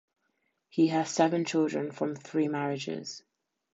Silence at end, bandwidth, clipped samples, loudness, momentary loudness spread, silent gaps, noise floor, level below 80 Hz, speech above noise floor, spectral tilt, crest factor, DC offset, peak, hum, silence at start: 0.6 s; 8 kHz; under 0.1%; -30 LUFS; 11 LU; none; -77 dBFS; -80 dBFS; 49 dB; -5.5 dB/octave; 20 dB; under 0.1%; -12 dBFS; none; 0.75 s